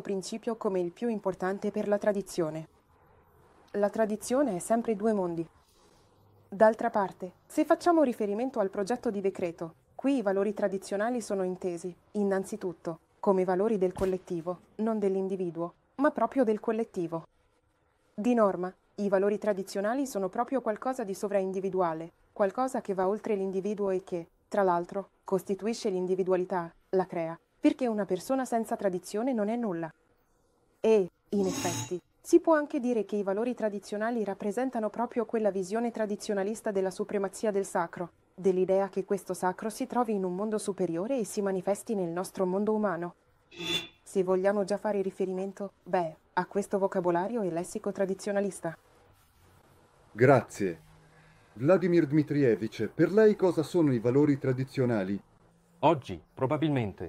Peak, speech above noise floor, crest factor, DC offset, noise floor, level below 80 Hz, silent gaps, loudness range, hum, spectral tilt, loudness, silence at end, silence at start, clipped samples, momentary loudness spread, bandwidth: -8 dBFS; 41 dB; 20 dB; under 0.1%; -70 dBFS; -66 dBFS; none; 4 LU; none; -6 dB/octave; -30 LUFS; 0 s; 0 s; under 0.1%; 10 LU; 15.5 kHz